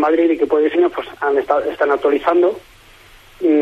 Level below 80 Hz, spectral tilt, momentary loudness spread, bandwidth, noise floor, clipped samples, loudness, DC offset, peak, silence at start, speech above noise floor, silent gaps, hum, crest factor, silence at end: -52 dBFS; -5.5 dB/octave; 5 LU; 7.2 kHz; -45 dBFS; under 0.1%; -16 LUFS; under 0.1%; -2 dBFS; 0 s; 29 dB; none; none; 14 dB; 0 s